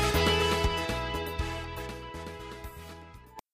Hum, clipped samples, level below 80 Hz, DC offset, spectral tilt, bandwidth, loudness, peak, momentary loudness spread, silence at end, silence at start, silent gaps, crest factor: none; under 0.1%; -40 dBFS; under 0.1%; -4 dB/octave; 15.5 kHz; -30 LUFS; -14 dBFS; 22 LU; 0.15 s; 0 s; none; 18 dB